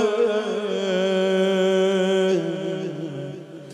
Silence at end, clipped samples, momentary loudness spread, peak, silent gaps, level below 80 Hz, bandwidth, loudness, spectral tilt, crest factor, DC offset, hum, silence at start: 0 s; under 0.1%; 12 LU; -8 dBFS; none; -76 dBFS; 11 kHz; -22 LUFS; -5.5 dB/octave; 12 dB; under 0.1%; none; 0 s